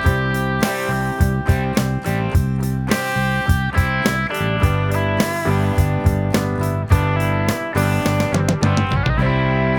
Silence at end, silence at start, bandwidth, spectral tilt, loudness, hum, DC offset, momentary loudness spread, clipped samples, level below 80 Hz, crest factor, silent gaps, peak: 0 s; 0 s; 20 kHz; -6 dB/octave; -19 LUFS; none; 0.1%; 3 LU; under 0.1%; -28 dBFS; 16 dB; none; -2 dBFS